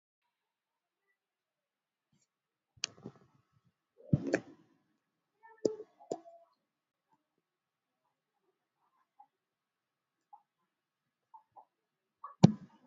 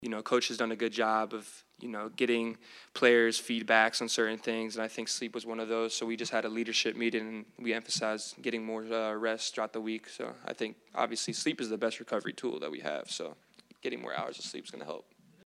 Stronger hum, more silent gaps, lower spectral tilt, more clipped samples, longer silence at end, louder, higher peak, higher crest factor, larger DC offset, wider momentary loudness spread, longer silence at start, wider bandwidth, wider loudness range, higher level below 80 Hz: neither; neither; first, -7 dB/octave vs -2.5 dB/octave; neither; second, 0.2 s vs 0.45 s; about the same, -34 LUFS vs -33 LUFS; first, -4 dBFS vs -8 dBFS; first, 36 dB vs 24 dB; neither; first, 26 LU vs 14 LU; first, 2.85 s vs 0 s; second, 7.4 kHz vs 13.5 kHz; first, 13 LU vs 7 LU; first, -68 dBFS vs -86 dBFS